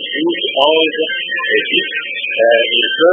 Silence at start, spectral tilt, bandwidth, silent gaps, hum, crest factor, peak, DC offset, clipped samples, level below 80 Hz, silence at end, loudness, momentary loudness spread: 0 s; -4.5 dB/octave; 3.8 kHz; none; none; 14 dB; 0 dBFS; under 0.1%; under 0.1%; -72 dBFS; 0 s; -13 LUFS; 7 LU